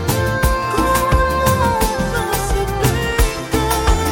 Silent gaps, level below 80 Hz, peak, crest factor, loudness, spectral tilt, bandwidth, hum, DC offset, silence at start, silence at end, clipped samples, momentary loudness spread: none; -22 dBFS; -2 dBFS; 14 dB; -17 LUFS; -4.5 dB/octave; 17 kHz; none; under 0.1%; 0 s; 0 s; under 0.1%; 4 LU